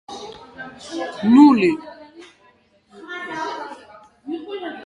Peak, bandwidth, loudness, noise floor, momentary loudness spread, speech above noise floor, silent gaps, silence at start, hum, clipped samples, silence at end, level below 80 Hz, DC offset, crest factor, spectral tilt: -2 dBFS; 10 kHz; -18 LUFS; -56 dBFS; 26 LU; 42 dB; none; 0.1 s; none; under 0.1%; 0 s; -64 dBFS; under 0.1%; 18 dB; -6 dB/octave